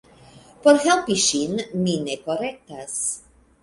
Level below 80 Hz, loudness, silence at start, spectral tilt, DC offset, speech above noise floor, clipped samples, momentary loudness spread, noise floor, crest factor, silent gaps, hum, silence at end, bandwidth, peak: -58 dBFS; -21 LUFS; 0.65 s; -3.5 dB/octave; under 0.1%; 27 dB; under 0.1%; 13 LU; -49 dBFS; 20 dB; none; none; 0.45 s; 11.5 kHz; -2 dBFS